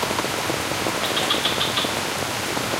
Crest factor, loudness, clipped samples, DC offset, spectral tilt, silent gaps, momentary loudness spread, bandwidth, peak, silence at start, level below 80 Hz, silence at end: 16 dB; -22 LUFS; under 0.1%; under 0.1%; -2.5 dB/octave; none; 4 LU; 16 kHz; -8 dBFS; 0 s; -50 dBFS; 0 s